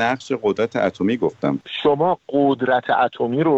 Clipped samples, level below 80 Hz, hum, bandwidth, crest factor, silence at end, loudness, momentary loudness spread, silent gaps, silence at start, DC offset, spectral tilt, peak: under 0.1%; -58 dBFS; none; 8 kHz; 16 dB; 0 s; -20 LUFS; 4 LU; none; 0 s; under 0.1%; -6.5 dB/octave; -4 dBFS